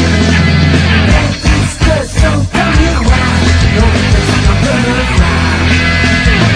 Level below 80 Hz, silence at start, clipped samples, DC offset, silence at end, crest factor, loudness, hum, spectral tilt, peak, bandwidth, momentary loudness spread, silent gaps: -14 dBFS; 0 s; 0.2%; under 0.1%; 0 s; 8 dB; -10 LUFS; none; -5.5 dB/octave; 0 dBFS; 10.5 kHz; 3 LU; none